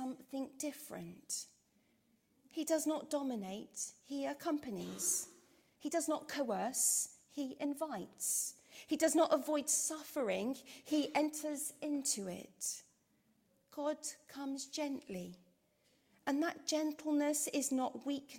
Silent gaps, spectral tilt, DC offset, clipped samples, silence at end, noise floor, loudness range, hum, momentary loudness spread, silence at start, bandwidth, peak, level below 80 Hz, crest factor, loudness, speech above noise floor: none; -2.5 dB/octave; under 0.1%; under 0.1%; 0 s; -75 dBFS; 7 LU; none; 13 LU; 0 s; 16.5 kHz; -20 dBFS; -82 dBFS; 20 dB; -38 LUFS; 37 dB